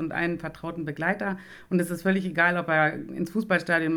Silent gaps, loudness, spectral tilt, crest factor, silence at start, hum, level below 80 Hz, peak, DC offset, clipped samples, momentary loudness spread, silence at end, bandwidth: none; -26 LUFS; -6.5 dB/octave; 18 dB; 0 s; none; -60 dBFS; -8 dBFS; under 0.1%; under 0.1%; 11 LU; 0 s; 18 kHz